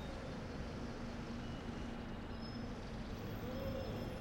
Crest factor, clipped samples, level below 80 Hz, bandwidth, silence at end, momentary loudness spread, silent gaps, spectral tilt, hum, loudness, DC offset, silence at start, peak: 14 dB; under 0.1%; -52 dBFS; 16 kHz; 0 s; 4 LU; none; -6.5 dB/octave; none; -46 LUFS; under 0.1%; 0 s; -30 dBFS